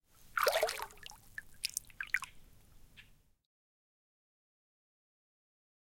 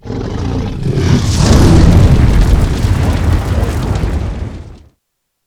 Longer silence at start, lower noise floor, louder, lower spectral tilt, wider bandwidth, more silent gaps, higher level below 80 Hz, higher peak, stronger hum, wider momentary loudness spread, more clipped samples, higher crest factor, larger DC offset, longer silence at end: first, 0.2 s vs 0.05 s; second, -62 dBFS vs -69 dBFS; second, -37 LUFS vs -12 LUFS; second, 0 dB/octave vs -6.5 dB/octave; first, 17 kHz vs 15 kHz; neither; second, -66 dBFS vs -16 dBFS; second, -10 dBFS vs 0 dBFS; neither; first, 18 LU vs 13 LU; second, under 0.1% vs 1%; first, 34 dB vs 10 dB; neither; first, 2.95 s vs 0.7 s